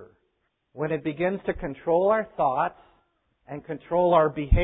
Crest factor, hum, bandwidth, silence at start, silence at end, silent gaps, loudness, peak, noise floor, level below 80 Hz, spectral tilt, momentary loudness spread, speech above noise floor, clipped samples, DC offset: 18 dB; none; 4 kHz; 0 s; 0 s; none; -25 LUFS; -6 dBFS; -74 dBFS; -36 dBFS; -11.5 dB/octave; 15 LU; 50 dB; under 0.1%; under 0.1%